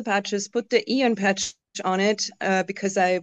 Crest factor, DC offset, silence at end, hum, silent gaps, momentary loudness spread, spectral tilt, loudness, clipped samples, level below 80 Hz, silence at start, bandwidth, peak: 16 dB; under 0.1%; 0 s; none; none; 6 LU; -3.5 dB/octave; -24 LUFS; under 0.1%; -68 dBFS; 0 s; 8.6 kHz; -6 dBFS